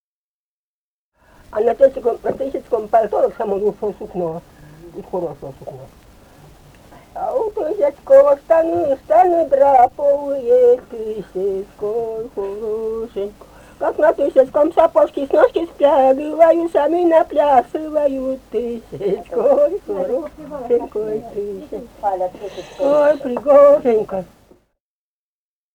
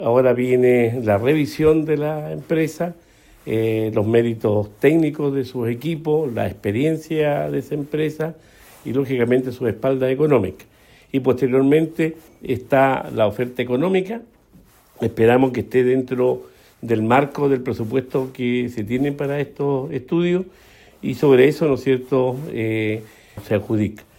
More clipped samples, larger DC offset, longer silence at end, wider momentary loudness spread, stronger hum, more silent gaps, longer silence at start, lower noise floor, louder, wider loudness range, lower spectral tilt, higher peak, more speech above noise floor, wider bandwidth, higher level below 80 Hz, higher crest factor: neither; neither; first, 1.5 s vs 0.2 s; first, 14 LU vs 10 LU; neither; neither; first, 1.5 s vs 0 s; first, under -90 dBFS vs -51 dBFS; first, -17 LUFS vs -20 LUFS; first, 9 LU vs 3 LU; about the same, -7 dB/octave vs -7.5 dB/octave; about the same, 0 dBFS vs -2 dBFS; first, over 74 dB vs 32 dB; second, 9.4 kHz vs 16.5 kHz; about the same, -50 dBFS vs -54 dBFS; about the same, 16 dB vs 16 dB